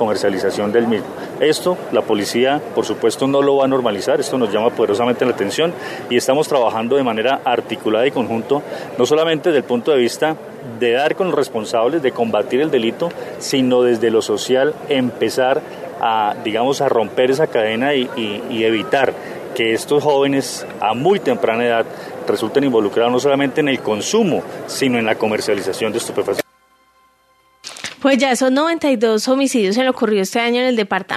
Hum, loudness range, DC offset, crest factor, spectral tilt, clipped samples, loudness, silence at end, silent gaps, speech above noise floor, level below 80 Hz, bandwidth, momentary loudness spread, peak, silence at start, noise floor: none; 2 LU; under 0.1%; 16 dB; -4.5 dB/octave; under 0.1%; -17 LUFS; 0 s; none; 39 dB; -64 dBFS; 14 kHz; 6 LU; 0 dBFS; 0 s; -56 dBFS